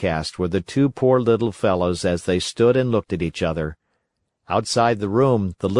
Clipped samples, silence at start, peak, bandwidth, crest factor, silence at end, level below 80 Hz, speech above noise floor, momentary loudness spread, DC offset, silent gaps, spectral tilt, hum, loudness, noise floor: under 0.1%; 0 s; -4 dBFS; 11.5 kHz; 16 dB; 0 s; -48 dBFS; 54 dB; 7 LU; under 0.1%; none; -6 dB/octave; none; -20 LUFS; -74 dBFS